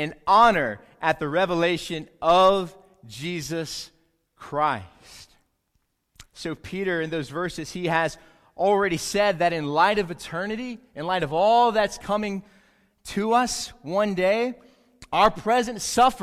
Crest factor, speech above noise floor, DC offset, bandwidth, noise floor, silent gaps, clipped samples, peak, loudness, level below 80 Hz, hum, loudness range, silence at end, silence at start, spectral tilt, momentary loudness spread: 18 dB; 49 dB; under 0.1%; 15.5 kHz; -72 dBFS; none; under 0.1%; -6 dBFS; -23 LUFS; -54 dBFS; none; 9 LU; 0 s; 0 s; -4 dB/octave; 15 LU